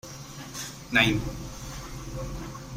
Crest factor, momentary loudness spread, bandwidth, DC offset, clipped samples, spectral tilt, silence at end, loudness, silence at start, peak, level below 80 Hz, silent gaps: 24 dB; 17 LU; 16 kHz; under 0.1%; under 0.1%; -4 dB/octave; 0 s; -29 LUFS; 0.05 s; -6 dBFS; -44 dBFS; none